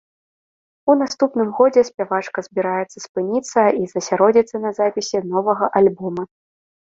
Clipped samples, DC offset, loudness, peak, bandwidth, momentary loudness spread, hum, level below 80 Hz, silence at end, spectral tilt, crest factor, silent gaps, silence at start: under 0.1%; under 0.1%; -19 LUFS; -2 dBFS; 7.8 kHz; 10 LU; none; -64 dBFS; 0.7 s; -5 dB/octave; 18 dB; 3.09-3.15 s; 0.85 s